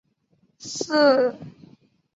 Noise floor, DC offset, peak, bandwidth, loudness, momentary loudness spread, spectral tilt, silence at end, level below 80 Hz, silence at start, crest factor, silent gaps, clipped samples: -66 dBFS; under 0.1%; -6 dBFS; 8 kHz; -20 LUFS; 23 LU; -3.5 dB/octave; 0.65 s; -72 dBFS; 0.6 s; 18 dB; none; under 0.1%